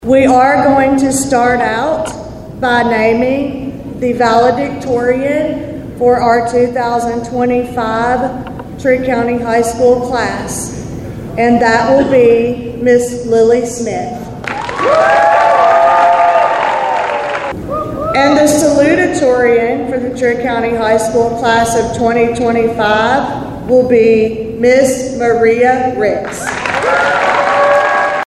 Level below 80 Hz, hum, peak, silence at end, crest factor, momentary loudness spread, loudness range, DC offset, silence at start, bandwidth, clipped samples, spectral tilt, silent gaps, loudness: -38 dBFS; none; 0 dBFS; 0 s; 12 dB; 11 LU; 3 LU; under 0.1%; 0 s; 13.5 kHz; under 0.1%; -5 dB/octave; none; -12 LUFS